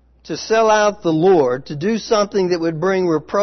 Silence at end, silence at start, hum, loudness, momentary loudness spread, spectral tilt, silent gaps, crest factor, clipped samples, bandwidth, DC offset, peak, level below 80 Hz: 0 s; 0.25 s; none; -17 LUFS; 8 LU; -5.5 dB/octave; none; 12 dB; under 0.1%; 6.4 kHz; under 0.1%; -4 dBFS; -52 dBFS